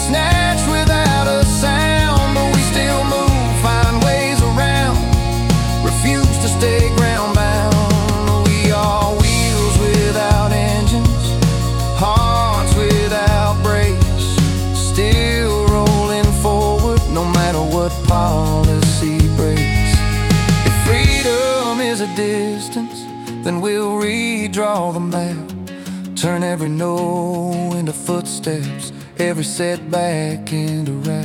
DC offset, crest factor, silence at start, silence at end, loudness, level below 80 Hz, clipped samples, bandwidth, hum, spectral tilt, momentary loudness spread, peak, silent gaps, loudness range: under 0.1%; 12 dB; 0 s; 0 s; -16 LUFS; -22 dBFS; under 0.1%; 17.5 kHz; none; -5 dB/octave; 7 LU; -2 dBFS; none; 6 LU